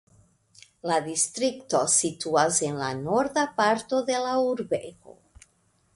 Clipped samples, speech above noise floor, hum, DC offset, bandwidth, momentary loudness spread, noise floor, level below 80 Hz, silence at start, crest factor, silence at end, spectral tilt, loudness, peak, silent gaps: under 0.1%; 41 dB; none; under 0.1%; 11.5 kHz; 8 LU; -67 dBFS; -64 dBFS; 0.85 s; 20 dB; 0.85 s; -3 dB/octave; -25 LUFS; -8 dBFS; none